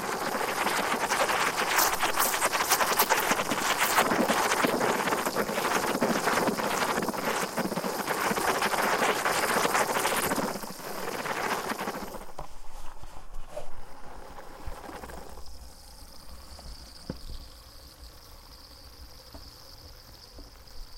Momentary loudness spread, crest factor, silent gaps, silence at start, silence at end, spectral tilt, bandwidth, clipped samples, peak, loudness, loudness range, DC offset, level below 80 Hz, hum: 24 LU; 22 dB; none; 0 s; 0 s; -2 dB/octave; 17 kHz; under 0.1%; -8 dBFS; -27 LUFS; 21 LU; under 0.1%; -48 dBFS; none